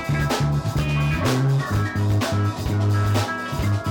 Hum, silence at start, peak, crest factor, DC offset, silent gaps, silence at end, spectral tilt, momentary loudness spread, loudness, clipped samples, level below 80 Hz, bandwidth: none; 0 s; -12 dBFS; 8 dB; under 0.1%; none; 0 s; -6 dB/octave; 3 LU; -22 LUFS; under 0.1%; -36 dBFS; 18 kHz